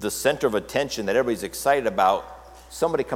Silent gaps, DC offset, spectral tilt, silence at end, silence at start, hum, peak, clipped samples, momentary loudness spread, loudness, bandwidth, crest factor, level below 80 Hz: none; under 0.1%; -3.5 dB/octave; 0 s; 0 s; none; -6 dBFS; under 0.1%; 6 LU; -23 LUFS; 17.5 kHz; 16 dB; -50 dBFS